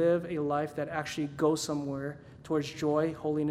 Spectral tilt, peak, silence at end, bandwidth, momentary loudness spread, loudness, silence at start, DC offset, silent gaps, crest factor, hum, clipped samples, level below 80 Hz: -5.5 dB/octave; -14 dBFS; 0 s; 15 kHz; 7 LU; -32 LUFS; 0 s; under 0.1%; none; 16 dB; none; under 0.1%; -62 dBFS